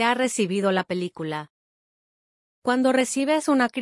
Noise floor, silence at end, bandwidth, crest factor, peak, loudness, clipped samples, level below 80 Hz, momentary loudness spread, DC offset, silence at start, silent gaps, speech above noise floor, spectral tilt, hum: under -90 dBFS; 0 s; 12 kHz; 16 dB; -8 dBFS; -23 LUFS; under 0.1%; -74 dBFS; 10 LU; under 0.1%; 0 s; 1.50-2.62 s; over 67 dB; -4 dB/octave; none